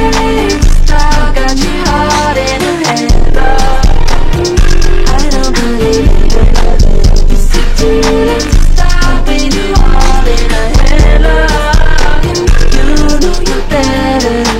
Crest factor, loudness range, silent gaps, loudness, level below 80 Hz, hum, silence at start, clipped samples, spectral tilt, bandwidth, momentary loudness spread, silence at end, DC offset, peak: 4 dB; 1 LU; none; -11 LUFS; -6 dBFS; none; 0 s; 0.3%; -5 dB/octave; 11.5 kHz; 3 LU; 0 s; under 0.1%; 0 dBFS